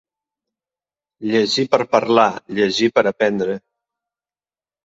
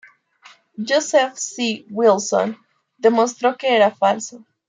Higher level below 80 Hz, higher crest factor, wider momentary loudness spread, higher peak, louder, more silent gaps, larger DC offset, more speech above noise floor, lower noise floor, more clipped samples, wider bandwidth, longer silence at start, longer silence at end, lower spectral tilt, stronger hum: first, -62 dBFS vs -76 dBFS; about the same, 20 dB vs 16 dB; second, 8 LU vs 11 LU; first, 0 dBFS vs -4 dBFS; about the same, -17 LUFS vs -18 LUFS; neither; neither; first, over 73 dB vs 32 dB; first, under -90 dBFS vs -50 dBFS; neither; second, 8 kHz vs 9.6 kHz; first, 1.2 s vs 0.8 s; first, 1.25 s vs 0.3 s; first, -4.5 dB/octave vs -3 dB/octave; neither